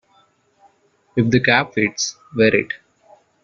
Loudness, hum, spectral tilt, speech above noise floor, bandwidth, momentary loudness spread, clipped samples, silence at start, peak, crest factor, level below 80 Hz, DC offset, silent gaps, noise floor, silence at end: -18 LUFS; none; -4 dB/octave; 41 dB; 7.6 kHz; 11 LU; under 0.1%; 1.15 s; -2 dBFS; 18 dB; -56 dBFS; under 0.1%; none; -58 dBFS; 0.7 s